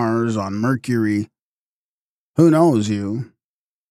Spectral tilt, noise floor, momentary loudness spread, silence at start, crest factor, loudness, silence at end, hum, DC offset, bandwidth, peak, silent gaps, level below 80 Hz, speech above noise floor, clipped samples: -7.5 dB/octave; under -90 dBFS; 14 LU; 0 s; 16 dB; -19 LUFS; 0.65 s; none; under 0.1%; 14 kHz; -4 dBFS; 1.41-2.34 s; -64 dBFS; over 73 dB; under 0.1%